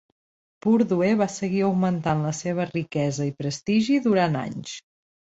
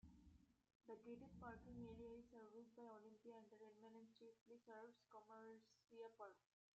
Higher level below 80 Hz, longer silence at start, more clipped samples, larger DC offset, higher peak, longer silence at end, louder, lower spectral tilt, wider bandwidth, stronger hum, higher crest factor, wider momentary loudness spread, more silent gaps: first, -60 dBFS vs -80 dBFS; first, 0.65 s vs 0.05 s; neither; neither; first, -8 dBFS vs -46 dBFS; first, 0.6 s vs 0.4 s; first, -24 LUFS vs -63 LUFS; about the same, -6 dB/octave vs -6 dB/octave; about the same, 8 kHz vs 7.6 kHz; neither; about the same, 16 dB vs 16 dB; about the same, 9 LU vs 8 LU; second, none vs 0.75-0.80 s, 4.41-4.46 s